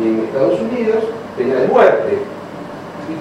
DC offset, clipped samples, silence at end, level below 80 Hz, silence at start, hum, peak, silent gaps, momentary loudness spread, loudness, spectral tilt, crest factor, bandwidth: under 0.1%; under 0.1%; 0 s; -56 dBFS; 0 s; none; 0 dBFS; none; 18 LU; -15 LUFS; -7 dB/octave; 16 dB; 11 kHz